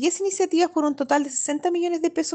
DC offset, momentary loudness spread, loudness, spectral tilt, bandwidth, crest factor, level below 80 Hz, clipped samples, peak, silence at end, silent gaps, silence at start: under 0.1%; 3 LU; -23 LUFS; -1.5 dB/octave; 9.2 kHz; 14 dB; -72 dBFS; under 0.1%; -8 dBFS; 0 s; none; 0 s